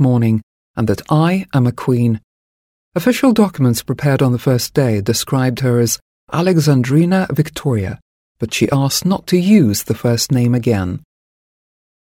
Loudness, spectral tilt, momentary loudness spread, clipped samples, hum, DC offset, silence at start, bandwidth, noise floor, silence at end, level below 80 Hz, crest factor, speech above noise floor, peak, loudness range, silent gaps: -15 LUFS; -6 dB/octave; 9 LU; under 0.1%; none; under 0.1%; 0 s; 17 kHz; under -90 dBFS; 1.2 s; -48 dBFS; 14 dB; over 76 dB; -2 dBFS; 1 LU; 0.43-0.74 s, 2.24-2.92 s, 6.02-6.27 s, 8.02-8.35 s